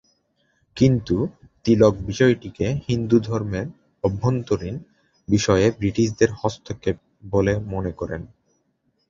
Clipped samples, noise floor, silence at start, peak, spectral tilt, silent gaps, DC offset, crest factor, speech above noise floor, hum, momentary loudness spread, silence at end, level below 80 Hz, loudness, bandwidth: under 0.1%; -69 dBFS; 0.75 s; -2 dBFS; -6.5 dB/octave; none; under 0.1%; 20 dB; 48 dB; none; 13 LU; 0.85 s; -44 dBFS; -22 LUFS; 7.6 kHz